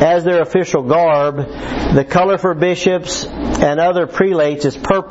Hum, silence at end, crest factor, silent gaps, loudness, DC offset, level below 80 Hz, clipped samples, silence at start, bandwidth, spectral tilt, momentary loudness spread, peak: none; 0 s; 14 dB; none; -15 LUFS; 0.1%; -34 dBFS; under 0.1%; 0 s; 8 kHz; -5.5 dB/octave; 8 LU; 0 dBFS